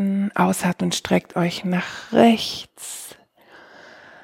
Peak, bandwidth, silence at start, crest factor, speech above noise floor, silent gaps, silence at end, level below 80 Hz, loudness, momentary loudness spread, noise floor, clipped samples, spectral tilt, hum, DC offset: -2 dBFS; 16.5 kHz; 0 s; 20 dB; 29 dB; none; 1.1 s; -60 dBFS; -21 LUFS; 16 LU; -50 dBFS; under 0.1%; -5 dB/octave; none; under 0.1%